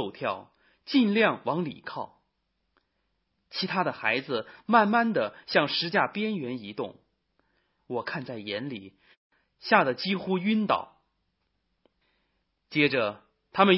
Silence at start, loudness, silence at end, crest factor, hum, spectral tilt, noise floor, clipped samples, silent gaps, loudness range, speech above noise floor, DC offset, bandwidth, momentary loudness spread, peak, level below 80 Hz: 0 s; -27 LUFS; 0 s; 24 dB; none; -9 dB/octave; -77 dBFS; under 0.1%; 9.17-9.30 s; 6 LU; 50 dB; under 0.1%; 5.8 kHz; 15 LU; -4 dBFS; -72 dBFS